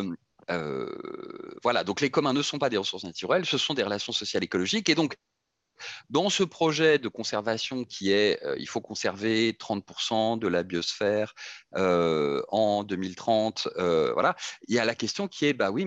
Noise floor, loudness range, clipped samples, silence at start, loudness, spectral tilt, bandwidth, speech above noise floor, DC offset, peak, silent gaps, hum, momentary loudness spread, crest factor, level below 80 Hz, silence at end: -81 dBFS; 2 LU; under 0.1%; 0 s; -27 LUFS; -4 dB/octave; 8.8 kHz; 54 dB; under 0.1%; -8 dBFS; none; none; 11 LU; 20 dB; -70 dBFS; 0 s